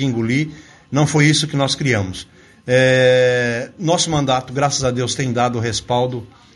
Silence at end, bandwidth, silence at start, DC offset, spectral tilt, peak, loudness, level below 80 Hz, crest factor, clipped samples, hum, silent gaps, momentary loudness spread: 0.3 s; 11.5 kHz; 0 s; under 0.1%; -4.5 dB/octave; 0 dBFS; -17 LUFS; -48 dBFS; 18 dB; under 0.1%; none; none; 10 LU